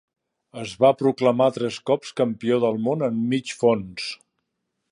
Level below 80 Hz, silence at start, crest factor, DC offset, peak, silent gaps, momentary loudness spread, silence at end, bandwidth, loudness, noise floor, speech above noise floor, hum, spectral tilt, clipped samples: -64 dBFS; 0.55 s; 18 dB; under 0.1%; -4 dBFS; none; 13 LU; 0.75 s; 11 kHz; -22 LUFS; -78 dBFS; 56 dB; none; -6 dB/octave; under 0.1%